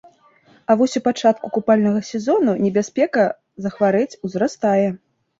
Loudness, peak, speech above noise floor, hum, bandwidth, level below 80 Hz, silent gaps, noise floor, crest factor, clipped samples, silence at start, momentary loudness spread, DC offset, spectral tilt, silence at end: -19 LUFS; -2 dBFS; 36 dB; none; 7.8 kHz; -62 dBFS; none; -54 dBFS; 16 dB; under 0.1%; 0.7 s; 7 LU; under 0.1%; -6 dB/octave; 0.45 s